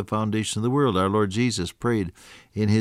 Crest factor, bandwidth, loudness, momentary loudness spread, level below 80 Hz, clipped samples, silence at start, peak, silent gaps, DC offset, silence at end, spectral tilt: 14 dB; 14 kHz; -24 LUFS; 6 LU; -54 dBFS; under 0.1%; 0 s; -10 dBFS; none; under 0.1%; 0 s; -6 dB/octave